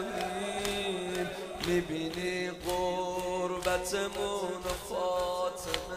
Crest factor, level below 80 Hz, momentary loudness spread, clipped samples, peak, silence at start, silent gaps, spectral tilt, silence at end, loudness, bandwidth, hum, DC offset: 22 dB; -52 dBFS; 4 LU; under 0.1%; -12 dBFS; 0 s; none; -3.5 dB/octave; 0 s; -33 LUFS; 16 kHz; none; under 0.1%